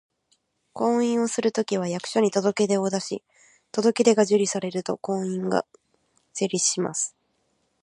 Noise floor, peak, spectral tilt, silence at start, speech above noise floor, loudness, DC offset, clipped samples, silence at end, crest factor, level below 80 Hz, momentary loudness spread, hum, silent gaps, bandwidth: -71 dBFS; -4 dBFS; -4 dB/octave; 0.75 s; 47 dB; -24 LUFS; under 0.1%; under 0.1%; 0.75 s; 20 dB; -74 dBFS; 10 LU; none; none; 11.5 kHz